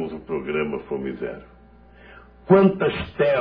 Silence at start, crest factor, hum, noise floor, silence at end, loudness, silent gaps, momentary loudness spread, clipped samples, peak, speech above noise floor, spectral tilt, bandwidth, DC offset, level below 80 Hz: 0 s; 20 dB; 60 Hz at -50 dBFS; -49 dBFS; 0 s; -22 LUFS; none; 16 LU; under 0.1%; -2 dBFS; 28 dB; -10.5 dB/octave; 5.2 kHz; under 0.1%; -48 dBFS